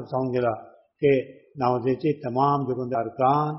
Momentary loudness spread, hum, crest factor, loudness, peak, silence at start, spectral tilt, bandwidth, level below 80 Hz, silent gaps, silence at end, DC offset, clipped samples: 6 LU; none; 16 dB; -24 LUFS; -8 dBFS; 0 s; -7 dB/octave; 5.8 kHz; -62 dBFS; none; 0 s; under 0.1%; under 0.1%